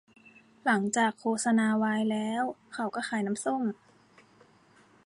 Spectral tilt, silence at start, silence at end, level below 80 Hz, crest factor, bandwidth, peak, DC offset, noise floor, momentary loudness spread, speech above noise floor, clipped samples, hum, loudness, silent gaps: -4.5 dB/octave; 0.65 s; 1.3 s; -76 dBFS; 16 dB; 11.5 kHz; -14 dBFS; under 0.1%; -61 dBFS; 9 LU; 32 dB; under 0.1%; none; -29 LUFS; none